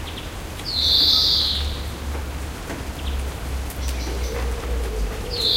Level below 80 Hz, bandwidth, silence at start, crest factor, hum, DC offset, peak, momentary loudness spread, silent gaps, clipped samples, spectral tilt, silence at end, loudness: -28 dBFS; 16.5 kHz; 0 s; 18 dB; none; under 0.1%; -6 dBFS; 17 LU; none; under 0.1%; -3.5 dB/octave; 0 s; -22 LUFS